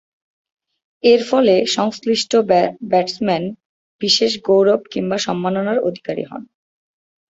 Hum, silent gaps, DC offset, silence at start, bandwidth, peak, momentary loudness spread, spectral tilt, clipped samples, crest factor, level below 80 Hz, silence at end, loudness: none; 3.65-3.99 s; under 0.1%; 1.05 s; 8 kHz; -2 dBFS; 11 LU; -4.5 dB/octave; under 0.1%; 16 dB; -62 dBFS; 0.9 s; -17 LUFS